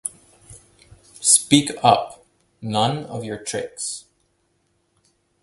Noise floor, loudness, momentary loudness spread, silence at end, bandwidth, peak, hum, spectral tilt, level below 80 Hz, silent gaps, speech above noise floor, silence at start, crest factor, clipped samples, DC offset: -67 dBFS; -20 LUFS; 18 LU; 1.4 s; 12 kHz; 0 dBFS; none; -3 dB/octave; -58 dBFS; none; 47 dB; 0.05 s; 24 dB; under 0.1%; under 0.1%